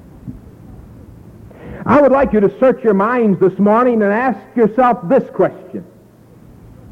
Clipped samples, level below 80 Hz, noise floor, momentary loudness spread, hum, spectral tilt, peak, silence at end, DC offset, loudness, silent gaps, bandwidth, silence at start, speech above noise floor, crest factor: under 0.1%; -44 dBFS; -44 dBFS; 20 LU; none; -9.5 dB/octave; -2 dBFS; 1.1 s; under 0.1%; -13 LUFS; none; 6.2 kHz; 0.25 s; 31 dB; 12 dB